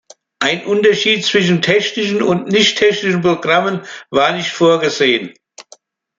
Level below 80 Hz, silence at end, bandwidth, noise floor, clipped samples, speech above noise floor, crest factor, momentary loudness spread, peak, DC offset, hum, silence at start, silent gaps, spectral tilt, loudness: -58 dBFS; 0.55 s; 7.8 kHz; -47 dBFS; under 0.1%; 33 dB; 14 dB; 7 LU; 0 dBFS; under 0.1%; none; 0.4 s; none; -4 dB/octave; -14 LUFS